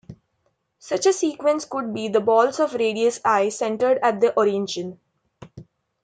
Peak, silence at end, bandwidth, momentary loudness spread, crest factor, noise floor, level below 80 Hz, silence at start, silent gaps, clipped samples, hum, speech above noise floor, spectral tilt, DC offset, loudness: -4 dBFS; 0.4 s; 9.4 kHz; 9 LU; 18 dB; -71 dBFS; -66 dBFS; 0.1 s; none; under 0.1%; none; 50 dB; -4 dB/octave; under 0.1%; -21 LUFS